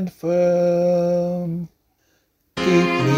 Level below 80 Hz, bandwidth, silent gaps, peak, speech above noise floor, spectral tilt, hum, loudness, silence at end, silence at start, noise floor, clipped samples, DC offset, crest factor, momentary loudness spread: -56 dBFS; 15 kHz; none; -4 dBFS; 46 dB; -7 dB/octave; none; -19 LUFS; 0 s; 0 s; -65 dBFS; under 0.1%; under 0.1%; 16 dB; 13 LU